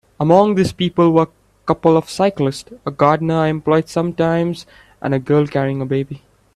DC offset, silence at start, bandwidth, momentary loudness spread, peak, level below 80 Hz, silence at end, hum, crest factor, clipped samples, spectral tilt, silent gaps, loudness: under 0.1%; 0.2 s; 13 kHz; 13 LU; 0 dBFS; -50 dBFS; 0.4 s; none; 16 dB; under 0.1%; -7 dB/octave; none; -17 LUFS